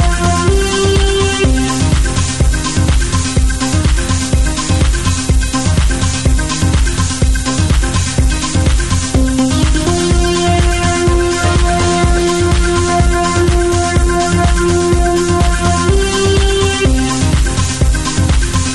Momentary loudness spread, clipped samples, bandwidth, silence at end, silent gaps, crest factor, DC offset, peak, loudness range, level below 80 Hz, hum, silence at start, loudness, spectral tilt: 2 LU; under 0.1%; 12 kHz; 0 s; none; 10 dB; under 0.1%; 0 dBFS; 2 LU; -16 dBFS; none; 0 s; -13 LUFS; -4.5 dB/octave